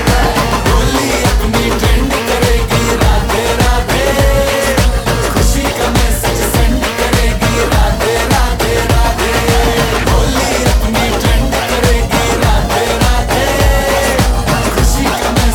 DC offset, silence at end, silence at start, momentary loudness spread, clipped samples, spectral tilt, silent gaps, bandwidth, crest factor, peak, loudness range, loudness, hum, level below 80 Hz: under 0.1%; 0 s; 0 s; 2 LU; under 0.1%; -4.5 dB/octave; none; 19 kHz; 10 dB; 0 dBFS; 0 LU; -12 LUFS; none; -16 dBFS